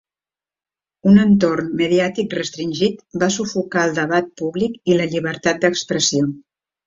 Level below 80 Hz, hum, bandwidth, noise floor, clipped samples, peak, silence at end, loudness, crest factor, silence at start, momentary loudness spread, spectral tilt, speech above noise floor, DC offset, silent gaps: -54 dBFS; none; 7.8 kHz; under -90 dBFS; under 0.1%; -2 dBFS; 0.45 s; -18 LUFS; 16 dB; 1.05 s; 9 LU; -5 dB/octave; over 72 dB; under 0.1%; none